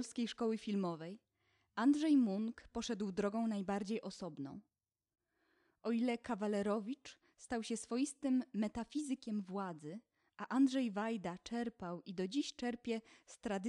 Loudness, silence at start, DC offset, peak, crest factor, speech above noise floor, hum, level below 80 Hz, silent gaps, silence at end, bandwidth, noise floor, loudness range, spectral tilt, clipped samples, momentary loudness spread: -39 LUFS; 0 s; under 0.1%; -22 dBFS; 16 dB; 40 dB; none; -72 dBFS; none; 0 s; 11.5 kHz; -79 dBFS; 5 LU; -5.5 dB/octave; under 0.1%; 15 LU